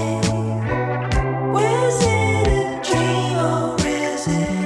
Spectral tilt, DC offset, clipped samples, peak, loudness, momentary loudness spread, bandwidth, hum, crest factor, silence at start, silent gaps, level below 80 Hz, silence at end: -5.5 dB/octave; under 0.1%; under 0.1%; -6 dBFS; -20 LUFS; 5 LU; 12.5 kHz; none; 14 dB; 0 s; none; -32 dBFS; 0 s